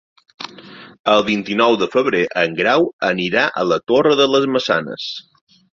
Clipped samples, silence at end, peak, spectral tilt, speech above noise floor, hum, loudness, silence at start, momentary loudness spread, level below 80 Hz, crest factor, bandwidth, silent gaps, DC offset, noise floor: under 0.1%; 0.6 s; -2 dBFS; -5 dB/octave; 23 dB; none; -16 LUFS; 0.4 s; 14 LU; -58 dBFS; 16 dB; 7.6 kHz; 0.99-1.04 s, 2.93-2.99 s; under 0.1%; -40 dBFS